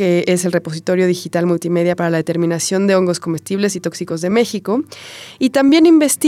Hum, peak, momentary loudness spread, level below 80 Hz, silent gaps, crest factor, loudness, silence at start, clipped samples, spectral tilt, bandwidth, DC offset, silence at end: none; -2 dBFS; 11 LU; -64 dBFS; none; 12 dB; -16 LUFS; 0 s; under 0.1%; -5 dB/octave; 16 kHz; under 0.1%; 0 s